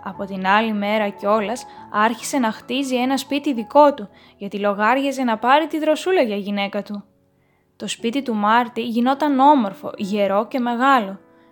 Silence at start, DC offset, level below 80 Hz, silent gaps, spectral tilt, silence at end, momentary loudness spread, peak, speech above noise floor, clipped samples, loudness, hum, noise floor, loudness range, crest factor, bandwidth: 0 s; under 0.1%; -66 dBFS; none; -4.5 dB/octave; 0.35 s; 14 LU; 0 dBFS; 42 dB; under 0.1%; -19 LUFS; none; -61 dBFS; 3 LU; 18 dB; 19 kHz